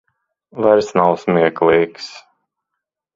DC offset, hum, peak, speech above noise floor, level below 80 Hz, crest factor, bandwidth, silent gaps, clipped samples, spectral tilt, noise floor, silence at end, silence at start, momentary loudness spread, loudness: under 0.1%; none; 0 dBFS; 65 dB; -56 dBFS; 18 dB; 7.6 kHz; none; under 0.1%; -6.5 dB/octave; -80 dBFS; 0.95 s; 0.55 s; 18 LU; -15 LUFS